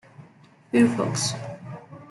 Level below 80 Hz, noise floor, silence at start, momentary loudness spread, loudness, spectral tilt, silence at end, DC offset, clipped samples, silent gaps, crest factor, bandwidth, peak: -64 dBFS; -53 dBFS; 0.2 s; 20 LU; -23 LUFS; -4.5 dB/octave; 0.05 s; under 0.1%; under 0.1%; none; 20 dB; 12 kHz; -6 dBFS